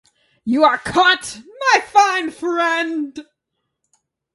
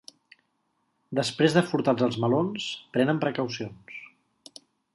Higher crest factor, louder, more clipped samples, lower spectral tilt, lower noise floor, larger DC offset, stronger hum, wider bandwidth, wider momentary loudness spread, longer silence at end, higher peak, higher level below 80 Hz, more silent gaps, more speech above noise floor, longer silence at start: about the same, 18 dB vs 22 dB; first, -16 LUFS vs -26 LUFS; neither; second, -2.5 dB/octave vs -6 dB/octave; about the same, -76 dBFS vs -74 dBFS; neither; neither; about the same, 11.5 kHz vs 11.5 kHz; about the same, 16 LU vs 15 LU; first, 1.1 s vs 0.9 s; first, 0 dBFS vs -6 dBFS; first, -56 dBFS vs -68 dBFS; neither; first, 59 dB vs 49 dB; second, 0.45 s vs 1.1 s